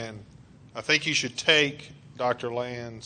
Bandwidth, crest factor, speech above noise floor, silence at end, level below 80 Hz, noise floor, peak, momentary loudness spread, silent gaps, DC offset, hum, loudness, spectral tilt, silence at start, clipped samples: 9.4 kHz; 24 dB; 24 dB; 0 s; -62 dBFS; -51 dBFS; -4 dBFS; 20 LU; none; under 0.1%; none; -25 LUFS; -2.5 dB/octave; 0 s; under 0.1%